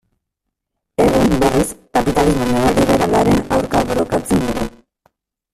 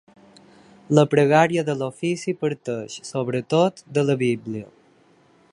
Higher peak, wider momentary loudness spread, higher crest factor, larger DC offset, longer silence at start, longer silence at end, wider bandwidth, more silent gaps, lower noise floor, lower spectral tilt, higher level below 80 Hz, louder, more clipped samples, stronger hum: about the same, -2 dBFS vs -2 dBFS; second, 5 LU vs 13 LU; about the same, 16 dB vs 20 dB; neither; about the same, 1 s vs 0.9 s; about the same, 0.85 s vs 0.9 s; first, 15.5 kHz vs 11.5 kHz; neither; first, -78 dBFS vs -57 dBFS; about the same, -5.5 dB/octave vs -6 dB/octave; first, -32 dBFS vs -66 dBFS; first, -16 LUFS vs -22 LUFS; neither; neither